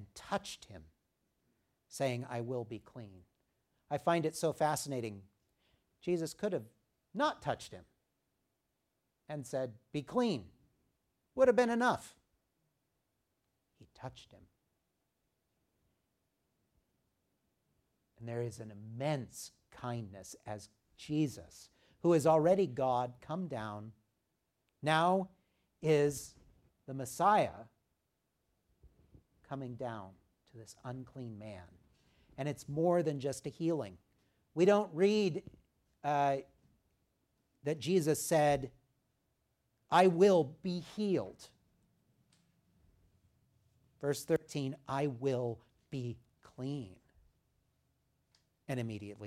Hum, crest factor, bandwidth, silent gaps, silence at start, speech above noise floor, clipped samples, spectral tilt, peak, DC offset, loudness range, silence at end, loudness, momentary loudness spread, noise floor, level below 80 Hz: none; 24 dB; 15.5 kHz; none; 0 s; 50 dB; under 0.1%; -5.5 dB/octave; -14 dBFS; under 0.1%; 12 LU; 0 s; -34 LUFS; 20 LU; -84 dBFS; -72 dBFS